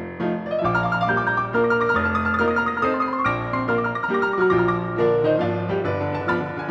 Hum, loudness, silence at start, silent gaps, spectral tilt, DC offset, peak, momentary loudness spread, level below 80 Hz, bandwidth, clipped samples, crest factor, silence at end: none; -21 LUFS; 0 s; none; -8 dB/octave; under 0.1%; -8 dBFS; 5 LU; -48 dBFS; 7.6 kHz; under 0.1%; 14 dB; 0 s